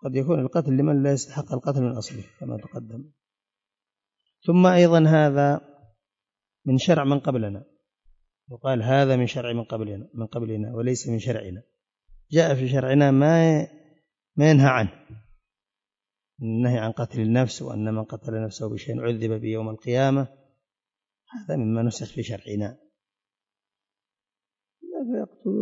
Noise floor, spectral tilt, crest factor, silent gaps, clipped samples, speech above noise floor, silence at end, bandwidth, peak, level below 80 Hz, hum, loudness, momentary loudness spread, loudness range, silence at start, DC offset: under -90 dBFS; -7 dB/octave; 18 dB; none; under 0.1%; over 68 dB; 0 s; 8 kHz; -6 dBFS; -64 dBFS; none; -23 LUFS; 17 LU; 11 LU; 0 s; under 0.1%